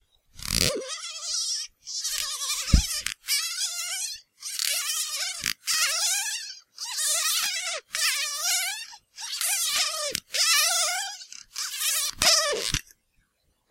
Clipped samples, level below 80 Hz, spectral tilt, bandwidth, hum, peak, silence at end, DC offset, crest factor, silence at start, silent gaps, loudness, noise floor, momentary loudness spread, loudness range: under 0.1%; -38 dBFS; -0.5 dB/octave; 16.5 kHz; none; -2 dBFS; 0.9 s; under 0.1%; 26 dB; 0.35 s; none; -25 LUFS; -71 dBFS; 12 LU; 4 LU